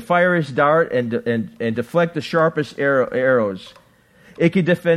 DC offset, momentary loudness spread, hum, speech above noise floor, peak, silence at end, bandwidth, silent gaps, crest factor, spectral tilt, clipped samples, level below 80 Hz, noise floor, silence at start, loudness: under 0.1%; 7 LU; none; 33 dB; -2 dBFS; 0 s; 13 kHz; none; 18 dB; -7.5 dB/octave; under 0.1%; -60 dBFS; -51 dBFS; 0 s; -19 LUFS